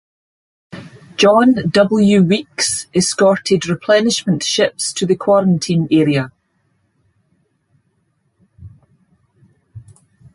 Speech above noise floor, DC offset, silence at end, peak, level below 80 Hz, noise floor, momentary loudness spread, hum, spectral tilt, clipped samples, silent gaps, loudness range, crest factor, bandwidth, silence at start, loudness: 50 dB; under 0.1%; 0.55 s; 0 dBFS; -54 dBFS; -64 dBFS; 8 LU; none; -4.5 dB/octave; under 0.1%; none; 7 LU; 16 dB; 11.5 kHz; 0.75 s; -14 LUFS